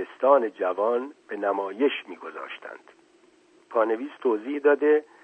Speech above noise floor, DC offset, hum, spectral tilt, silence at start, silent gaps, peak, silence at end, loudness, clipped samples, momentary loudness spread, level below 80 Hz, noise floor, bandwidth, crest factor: 34 dB; under 0.1%; none; -5.5 dB/octave; 0 s; none; -6 dBFS; 0.2 s; -25 LUFS; under 0.1%; 17 LU; -88 dBFS; -59 dBFS; 4.3 kHz; 20 dB